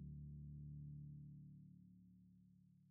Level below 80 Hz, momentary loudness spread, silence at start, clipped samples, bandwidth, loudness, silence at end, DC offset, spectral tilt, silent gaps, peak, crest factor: -68 dBFS; 13 LU; 0 s; under 0.1%; 0.5 kHz; -58 LUFS; 0 s; under 0.1%; -19 dB/octave; none; -46 dBFS; 12 dB